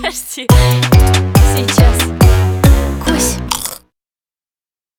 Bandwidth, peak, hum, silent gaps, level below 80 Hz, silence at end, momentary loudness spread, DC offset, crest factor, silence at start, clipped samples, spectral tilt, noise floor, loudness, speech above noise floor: 19.5 kHz; 0 dBFS; none; none; -16 dBFS; 1.2 s; 9 LU; under 0.1%; 12 dB; 0 s; under 0.1%; -5 dB/octave; under -90 dBFS; -12 LUFS; over 80 dB